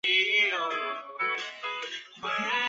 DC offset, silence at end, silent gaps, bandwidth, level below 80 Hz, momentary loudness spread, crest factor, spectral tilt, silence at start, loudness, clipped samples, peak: under 0.1%; 0 s; none; 8.4 kHz; -80 dBFS; 13 LU; 16 dB; -1 dB/octave; 0.05 s; -28 LUFS; under 0.1%; -12 dBFS